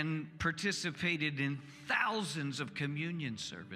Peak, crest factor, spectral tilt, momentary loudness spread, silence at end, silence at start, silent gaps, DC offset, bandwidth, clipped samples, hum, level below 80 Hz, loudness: -16 dBFS; 20 dB; -4.5 dB/octave; 6 LU; 0 s; 0 s; none; under 0.1%; 14.5 kHz; under 0.1%; none; -66 dBFS; -36 LUFS